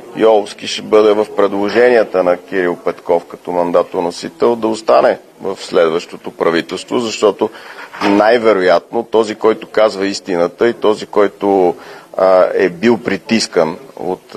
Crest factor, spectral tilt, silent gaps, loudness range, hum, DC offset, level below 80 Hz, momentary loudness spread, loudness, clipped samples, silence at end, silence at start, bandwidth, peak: 14 dB; -4.5 dB/octave; none; 2 LU; none; under 0.1%; -56 dBFS; 11 LU; -14 LUFS; under 0.1%; 0.2 s; 0 s; 13.5 kHz; 0 dBFS